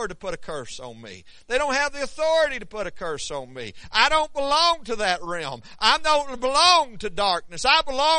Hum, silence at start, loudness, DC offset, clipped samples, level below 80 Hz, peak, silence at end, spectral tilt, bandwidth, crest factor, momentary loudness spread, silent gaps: none; 0 s; -22 LUFS; under 0.1%; under 0.1%; -46 dBFS; 0 dBFS; 0 s; -1.5 dB/octave; 10.5 kHz; 22 dB; 16 LU; none